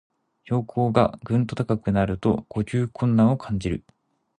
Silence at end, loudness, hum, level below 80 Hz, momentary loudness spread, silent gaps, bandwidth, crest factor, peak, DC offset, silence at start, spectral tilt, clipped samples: 0.6 s; -24 LUFS; none; -46 dBFS; 8 LU; none; 10 kHz; 20 dB; -4 dBFS; under 0.1%; 0.5 s; -8.5 dB/octave; under 0.1%